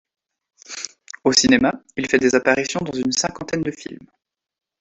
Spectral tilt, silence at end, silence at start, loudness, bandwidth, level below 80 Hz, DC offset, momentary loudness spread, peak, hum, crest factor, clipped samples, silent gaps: -3 dB/octave; 0.85 s; 0.7 s; -19 LUFS; 8.4 kHz; -54 dBFS; under 0.1%; 17 LU; 0 dBFS; none; 22 dB; under 0.1%; none